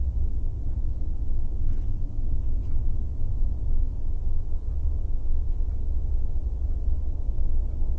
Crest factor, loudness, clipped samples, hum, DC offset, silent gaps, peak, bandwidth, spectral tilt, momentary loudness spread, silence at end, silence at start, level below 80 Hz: 10 dB; -32 LUFS; under 0.1%; none; under 0.1%; none; -12 dBFS; 1.1 kHz; -10.5 dB/octave; 2 LU; 0 s; 0 s; -24 dBFS